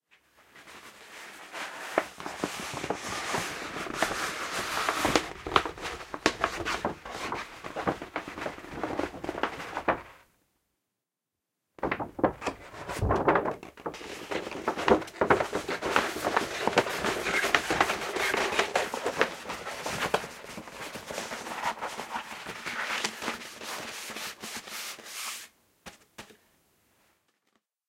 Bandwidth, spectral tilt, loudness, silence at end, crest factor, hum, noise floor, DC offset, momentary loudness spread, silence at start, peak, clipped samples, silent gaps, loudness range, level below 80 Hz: 16.5 kHz; -3 dB/octave; -31 LUFS; 1.55 s; 30 dB; none; -87 dBFS; under 0.1%; 14 LU; 0.55 s; -4 dBFS; under 0.1%; none; 9 LU; -54 dBFS